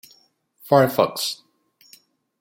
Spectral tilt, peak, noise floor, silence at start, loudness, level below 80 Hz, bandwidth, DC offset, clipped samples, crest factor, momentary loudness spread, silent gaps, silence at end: -4.5 dB/octave; -2 dBFS; -60 dBFS; 0.65 s; -20 LUFS; -68 dBFS; 17 kHz; under 0.1%; under 0.1%; 22 dB; 11 LU; none; 1.05 s